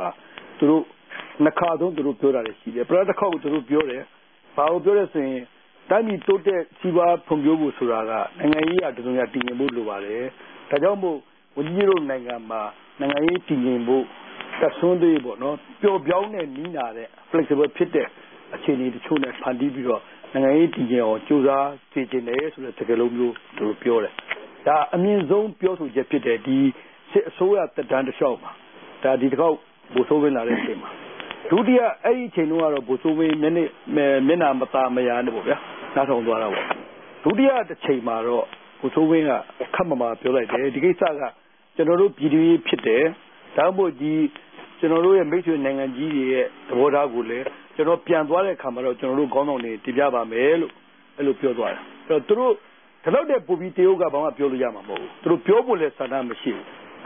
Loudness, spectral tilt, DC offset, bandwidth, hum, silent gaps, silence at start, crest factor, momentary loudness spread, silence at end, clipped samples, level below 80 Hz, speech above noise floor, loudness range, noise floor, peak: -22 LUFS; -11 dB/octave; under 0.1%; 3.9 kHz; none; none; 0 s; 22 dB; 11 LU; 0 s; under 0.1%; -66 dBFS; 21 dB; 3 LU; -42 dBFS; 0 dBFS